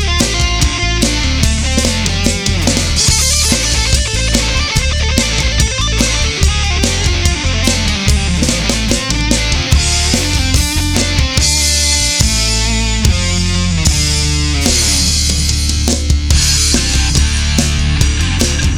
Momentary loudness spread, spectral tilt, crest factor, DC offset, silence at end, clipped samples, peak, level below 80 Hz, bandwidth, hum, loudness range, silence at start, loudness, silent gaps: 4 LU; -3 dB/octave; 12 dB; under 0.1%; 0 s; under 0.1%; 0 dBFS; -16 dBFS; 18 kHz; none; 1 LU; 0 s; -12 LUFS; none